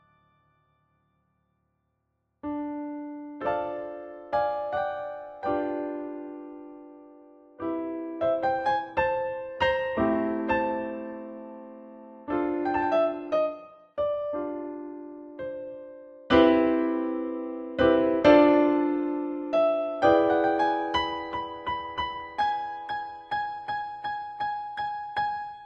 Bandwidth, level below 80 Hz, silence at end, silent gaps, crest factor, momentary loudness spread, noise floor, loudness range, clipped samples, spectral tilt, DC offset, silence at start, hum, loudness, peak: 6.6 kHz; -56 dBFS; 0 s; none; 22 dB; 19 LU; -77 dBFS; 11 LU; under 0.1%; -6.5 dB/octave; under 0.1%; 2.45 s; none; -27 LUFS; -6 dBFS